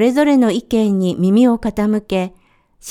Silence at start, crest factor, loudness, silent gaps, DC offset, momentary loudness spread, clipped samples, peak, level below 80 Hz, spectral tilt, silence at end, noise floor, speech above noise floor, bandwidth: 0 s; 14 dB; -15 LUFS; none; under 0.1%; 9 LU; under 0.1%; 0 dBFS; -44 dBFS; -7 dB/octave; 0 s; -45 dBFS; 31 dB; 14 kHz